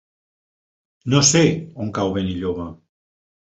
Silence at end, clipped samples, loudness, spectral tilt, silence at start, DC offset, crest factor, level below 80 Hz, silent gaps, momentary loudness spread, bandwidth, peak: 0.75 s; under 0.1%; -19 LUFS; -4 dB/octave; 1.05 s; under 0.1%; 20 dB; -46 dBFS; none; 16 LU; 8.4 kHz; -2 dBFS